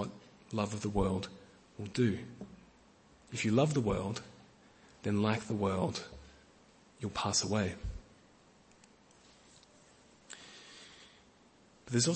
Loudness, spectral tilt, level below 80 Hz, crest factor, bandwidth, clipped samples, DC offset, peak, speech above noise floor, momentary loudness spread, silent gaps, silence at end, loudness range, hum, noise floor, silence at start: -35 LUFS; -5 dB/octave; -56 dBFS; 22 dB; 8.4 kHz; under 0.1%; under 0.1%; -16 dBFS; 31 dB; 22 LU; none; 0 s; 21 LU; none; -63 dBFS; 0 s